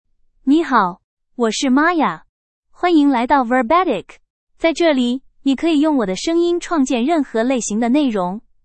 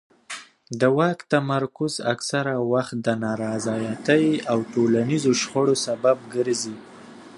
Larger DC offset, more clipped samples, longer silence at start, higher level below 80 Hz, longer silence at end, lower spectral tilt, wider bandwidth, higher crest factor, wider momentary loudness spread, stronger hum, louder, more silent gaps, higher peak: neither; neither; first, 0.45 s vs 0.3 s; first, -50 dBFS vs -66 dBFS; first, 0.25 s vs 0 s; about the same, -4 dB/octave vs -5 dB/octave; second, 8.8 kHz vs 11.5 kHz; about the same, 16 dB vs 18 dB; about the same, 7 LU vs 9 LU; neither; first, -17 LUFS vs -23 LUFS; first, 1.04-1.17 s, 2.29-2.63 s, 4.30-4.47 s vs none; about the same, -2 dBFS vs -4 dBFS